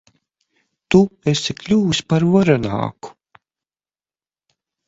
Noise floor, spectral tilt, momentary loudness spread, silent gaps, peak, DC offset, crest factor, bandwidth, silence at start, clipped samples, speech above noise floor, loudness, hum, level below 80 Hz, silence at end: under -90 dBFS; -6 dB/octave; 12 LU; none; 0 dBFS; under 0.1%; 20 dB; 8 kHz; 0.9 s; under 0.1%; over 74 dB; -17 LUFS; none; -50 dBFS; 1.8 s